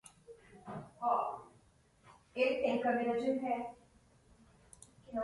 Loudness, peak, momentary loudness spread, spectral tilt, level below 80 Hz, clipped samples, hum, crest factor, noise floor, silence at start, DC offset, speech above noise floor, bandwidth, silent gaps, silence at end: -35 LUFS; -20 dBFS; 24 LU; -5.5 dB/octave; -72 dBFS; under 0.1%; none; 18 dB; -67 dBFS; 0.3 s; under 0.1%; 34 dB; 11.5 kHz; none; 0 s